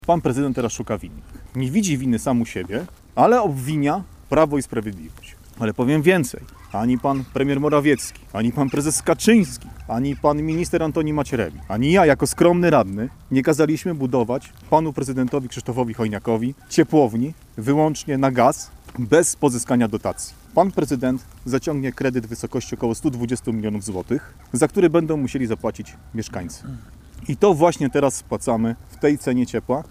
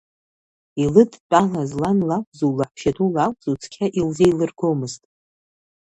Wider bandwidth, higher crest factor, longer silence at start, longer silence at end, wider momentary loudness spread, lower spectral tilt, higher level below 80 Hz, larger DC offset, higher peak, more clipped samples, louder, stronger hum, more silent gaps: first, 16 kHz vs 11 kHz; about the same, 18 dB vs 20 dB; second, 0.05 s vs 0.75 s; second, 0.05 s vs 0.9 s; first, 13 LU vs 10 LU; about the same, -6 dB/octave vs -7 dB/octave; first, -44 dBFS vs -52 dBFS; neither; about the same, -2 dBFS vs 0 dBFS; neither; about the same, -21 LUFS vs -20 LUFS; neither; second, none vs 1.20-1.30 s, 2.27-2.32 s